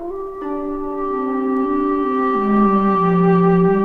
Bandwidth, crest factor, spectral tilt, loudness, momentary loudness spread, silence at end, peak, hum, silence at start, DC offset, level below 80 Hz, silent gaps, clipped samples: 4.5 kHz; 12 dB; -10.5 dB/octave; -17 LUFS; 11 LU; 0 s; -4 dBFS; none; 0 s; under 0.1%; -42 dBFS; none; under 0.1%